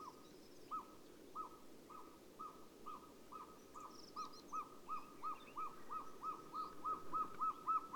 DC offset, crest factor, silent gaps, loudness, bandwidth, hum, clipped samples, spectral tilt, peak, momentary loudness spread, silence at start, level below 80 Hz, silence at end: under 0.1%; 18 dB; none; -49 LUFS; 19.5 kHz; none; under 0.1%; -4 dB/octave; -32 dBFS; 15 LU; 0 s; -76 dBFS; 0 s